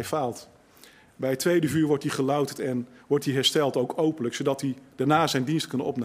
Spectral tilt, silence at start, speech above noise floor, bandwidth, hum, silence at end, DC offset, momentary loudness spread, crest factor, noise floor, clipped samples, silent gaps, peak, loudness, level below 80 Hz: -5 dB/octave; 0 s; 28 dB; 16 kHz; none; 0 s; under 0.1%; 8 LU; 18 dB; -54 dBFS; under 0.1%; none; -8 dBFS; -26 LUFS; -66 dBFS